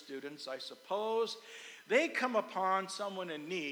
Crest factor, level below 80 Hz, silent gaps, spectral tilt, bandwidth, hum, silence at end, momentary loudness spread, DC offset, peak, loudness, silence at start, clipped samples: 20 dB; under -90 dBFS; none; -3.5 dB/octave; over 20 kHz; none; 0 s; 14 LU; under 0.1%; -18 dBFS; -36 LUFS; 0 s; under 0.1%